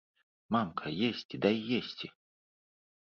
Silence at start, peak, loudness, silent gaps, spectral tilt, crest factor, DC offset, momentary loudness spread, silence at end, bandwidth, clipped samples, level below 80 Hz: 0.5 s; -12 dBFS; -33 LUFS; 1.25-1.29 s; -7 dB/octave; 22 dB; under 0.1%; 11 LU; 0.95 s; 6.6 kHz; under 0.1%; -70 dBFS